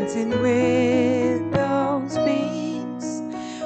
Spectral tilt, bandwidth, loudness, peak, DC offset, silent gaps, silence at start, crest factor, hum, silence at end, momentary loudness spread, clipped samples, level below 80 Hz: -6 dB/octave; 9 kHz; -22 LUFS; -6 dBFS; under 0.1%; none; 0 s; 16 dB; none; 0 s; 10 LU; under 0.1%; -56 dBFS